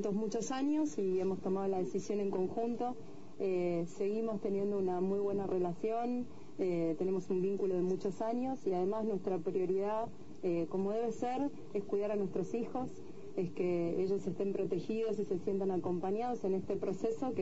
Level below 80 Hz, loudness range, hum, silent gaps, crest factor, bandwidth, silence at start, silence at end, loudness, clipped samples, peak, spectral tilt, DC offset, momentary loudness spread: -68 dBFS; 2 LU; none; none; 12 dB; 7.6 kHz; 0 s; 0 s; -36 LUFS; under 0.1%; -22 dBFS; -7.5 dB/octave; 0.5%; 5 LU